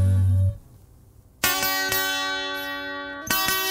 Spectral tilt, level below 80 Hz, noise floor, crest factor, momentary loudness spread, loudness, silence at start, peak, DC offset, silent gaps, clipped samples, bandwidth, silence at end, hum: -3 dB/octave; -48 dBFS; -52 dBFS; 24 dB; 10 LU; -23 LUFS; 0 s; 0 dBFS; under 0.1%; none; under 0.1%; 16.5 kHz; 0 s; none